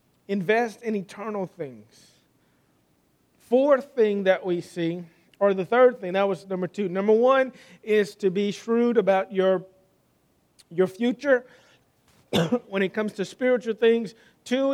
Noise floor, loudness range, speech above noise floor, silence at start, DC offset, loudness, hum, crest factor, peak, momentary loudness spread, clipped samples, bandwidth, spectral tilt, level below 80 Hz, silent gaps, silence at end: -66 dBFS; 5 LU; 42 dB; 0.3 s; under 0.1%; -24 LUFS; none; 18 dB; -8 dBFS; 11 LU; under 0.1%; 14 kHz; -6 dB/octave; -72 dBFS; none; 0 s